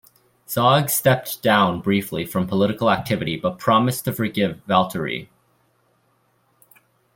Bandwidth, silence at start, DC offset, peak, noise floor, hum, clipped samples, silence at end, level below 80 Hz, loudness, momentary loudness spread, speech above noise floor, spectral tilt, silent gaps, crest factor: 17 kHz; 0.5 s; under 0.1%; -2 dBFS; -64 dBFS; none; under 0.1%; 1.9 s; -56 dBFS; -20 LUFS; 8 LU; 44 dB; -5 dB/octave; none; 18 dB